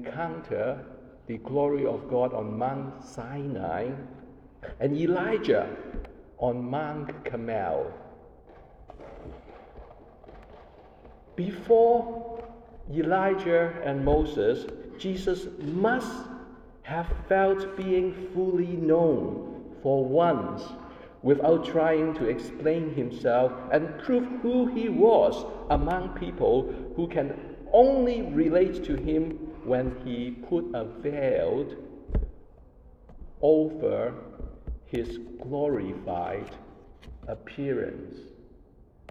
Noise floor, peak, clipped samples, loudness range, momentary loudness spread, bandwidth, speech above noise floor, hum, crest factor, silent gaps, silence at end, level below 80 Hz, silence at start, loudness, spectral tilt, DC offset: -55 dBFS; -6 dBFS; under 0.1%; 8 LU; 19 LU; 9 kHz; 28 dB; none; 22 dB; none; 0.65 s; -44 dBFS; 0 s; -27 LUFS; -8 dB/octave; under 0.1%